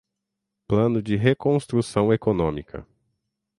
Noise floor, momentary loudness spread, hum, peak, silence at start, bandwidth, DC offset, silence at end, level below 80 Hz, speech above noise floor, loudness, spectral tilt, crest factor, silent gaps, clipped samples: -82 dBFS; 12 LU; none; -4 dBFS; 0.7 s; 11.5 kHz; under 0.1%; 0.75 s; -48 dBFS; 61 dB; -22 LUFS; -7.5 dB/octave; 20 dB; none; under 0.1%